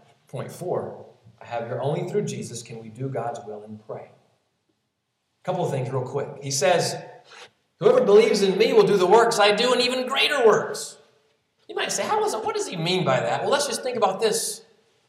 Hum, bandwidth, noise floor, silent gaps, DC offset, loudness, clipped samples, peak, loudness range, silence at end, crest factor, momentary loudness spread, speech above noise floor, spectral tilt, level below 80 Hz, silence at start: none; 15 kHz; -76 dBFS; none; under 0.1%; -22 LUFS; under 0.1%; -4 dBFS; 13 LU; 0.5 s; 20 dB; 19 LU; 54 dB; -3.5 dB/octave; -76 dBFS; 0.35 s